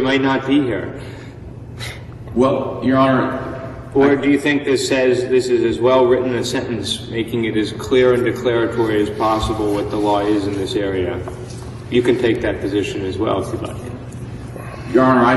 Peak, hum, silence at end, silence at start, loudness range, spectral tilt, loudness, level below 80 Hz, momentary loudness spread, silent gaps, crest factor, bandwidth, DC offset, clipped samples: 0 dBFS; none; 0 s; 0 s; 4 LU; -6 dB/octave; -17 LUFS; -40 dBFS; 16 LU; none; 18 dB; 12.5 kHz; under 0.1%; under 0.1%